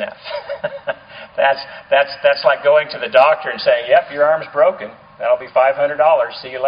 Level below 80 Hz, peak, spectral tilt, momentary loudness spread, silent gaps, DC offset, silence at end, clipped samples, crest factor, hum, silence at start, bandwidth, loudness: -62 dBFS; 0 dBFS; 0 dB/octave; 14 LU; none; under 0.1%; 0 s; under 0.1%; 16 dB; none; 0 s; 5.2 kHz; -16 LUFS